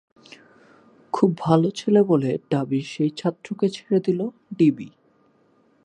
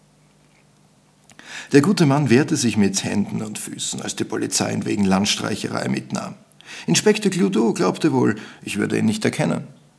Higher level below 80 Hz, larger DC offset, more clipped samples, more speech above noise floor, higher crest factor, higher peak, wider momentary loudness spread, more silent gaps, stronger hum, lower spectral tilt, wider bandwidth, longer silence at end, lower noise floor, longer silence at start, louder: about the same, -66 dBFS vs -64 dBFS; neither; neither; about the same, 39 dB vs 36 dB; about the same, 20 dB vs 20 dB; about the same, -2 dBFS vs 0 dBFS; second, 9 LU vs 12 LU; neither; second, none vs 50 Hz at -45 dBFS; first, -7.5 dB/octave vs -4.5 dB/octave; about the same, 10 kHz vs 11 kHz; first, 0.95 s vs 0.25 s; first, -61 dBFS vs -55 dBFS; second, 1.15 s vs 1.45 s; about the same, -22 LUFS vs -20 LUFS